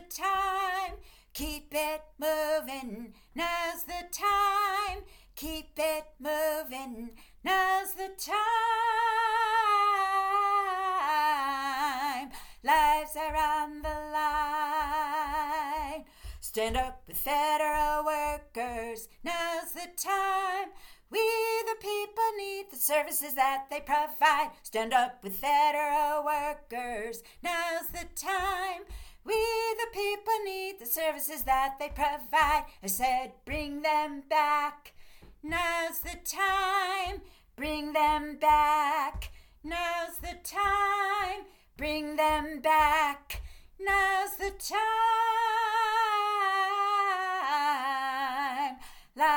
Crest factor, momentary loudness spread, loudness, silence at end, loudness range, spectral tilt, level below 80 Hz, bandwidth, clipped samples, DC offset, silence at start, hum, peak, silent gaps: 20 dB; 12 LU; -29 LUFS; 0 s; 5 LU; -2 dB/octave; -50 dBFS; 19 kHz; under 0.1%; under 0.1%; 0 s; none; -10 dBFS; none